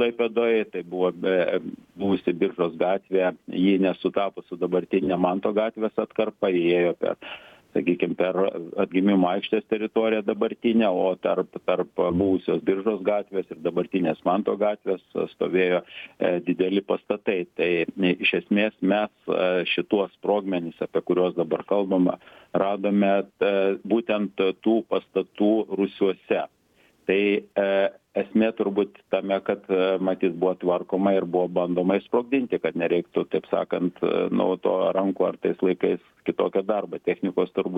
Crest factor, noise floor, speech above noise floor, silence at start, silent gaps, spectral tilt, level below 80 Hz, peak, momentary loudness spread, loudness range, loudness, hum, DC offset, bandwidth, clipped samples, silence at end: 16 dB; -61 dBFS; 38 dB; 0 s; none; -8.5 dB/octave; -64 dBFS; -8 dBFS; 6 LU; 1 LU; -24 LUFS; none; under 0.1%; 4.9 kHz; under 0.1%; 0 s